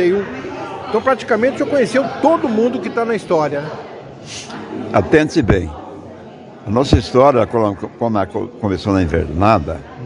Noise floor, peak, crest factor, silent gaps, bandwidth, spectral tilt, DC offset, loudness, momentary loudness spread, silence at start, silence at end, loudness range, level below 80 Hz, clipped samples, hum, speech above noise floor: -36 dBFS; 0 dBFS; 16 dB; none; 11 kHz; -6.5 dB/octave; under 0.1%; -16 LUFS; 17 LU; 0 s; 0 s; 3 LU; -36 dBFS; under 0.1%; none; 20 dB